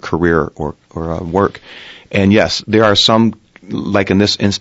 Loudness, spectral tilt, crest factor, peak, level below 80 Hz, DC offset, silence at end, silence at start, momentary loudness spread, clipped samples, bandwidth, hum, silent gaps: -13 LUFS; -5 dB/octave; 14 dB; 0 dBFS; -40 dBFS; under 0.1%; 0 s; 0 s; 16 LU; under 0.1%; 8 kHz; none; none